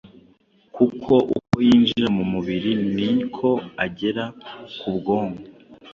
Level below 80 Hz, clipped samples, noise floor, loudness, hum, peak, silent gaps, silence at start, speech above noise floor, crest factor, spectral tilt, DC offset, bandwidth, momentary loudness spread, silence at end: -54 dBFS; under 0.1%; -57 dBFS; -21 LUFS; none; -4 dBFS; none; 0.05 s; 36 dB; 18 dB; -7.5 dB/octave; under 0.1%; 7.2 kHz; 14 LU; 0 s